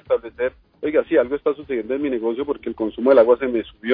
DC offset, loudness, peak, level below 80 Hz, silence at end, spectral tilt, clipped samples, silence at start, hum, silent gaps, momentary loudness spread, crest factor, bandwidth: under 0.1%; -20 LUFS; -4 dBFS; -52 dBFS; 0 s; -9 dB/octave; under 0.1%; 0.1 s; none; none; 12 LU; 16 dB; 5 kHz